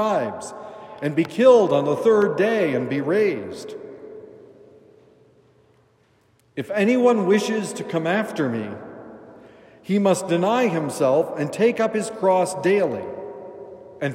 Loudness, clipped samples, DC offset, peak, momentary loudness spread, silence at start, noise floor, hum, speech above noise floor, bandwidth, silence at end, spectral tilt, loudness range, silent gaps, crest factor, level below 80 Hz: -21 LUFS; under 0.1%; under 0.1%; -4 dBFS; 21 LU; 0 s; -60 dBFS; none; 40 dB; 15.5 kHz; 0 s; -6 dB/octave; 9 LU; none; 18 dB; -72 dBFS